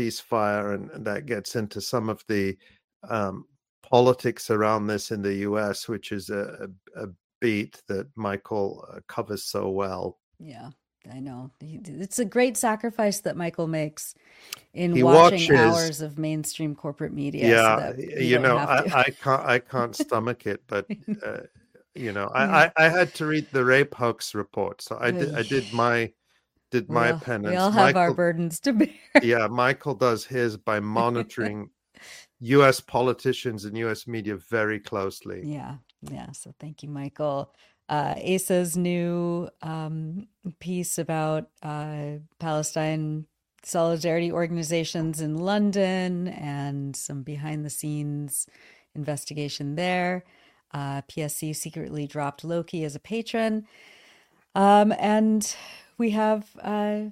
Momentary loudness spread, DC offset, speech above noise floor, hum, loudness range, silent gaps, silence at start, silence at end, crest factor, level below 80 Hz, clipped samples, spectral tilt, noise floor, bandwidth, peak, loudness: 18 LU; under 0.1%; 45 dB; none; 10 LU; 2.84-2.88 s, 2.96-3.00 s, 3.69-3.82 s, 7.24-7.41 s, 10.23-10.32 s; 0 s; 0 s; 24 dB; -64 dBFS; under 0.1%; -5 dB/octave; -70 dBFS; 16 kHz; 0 dBFS; -25 LUFS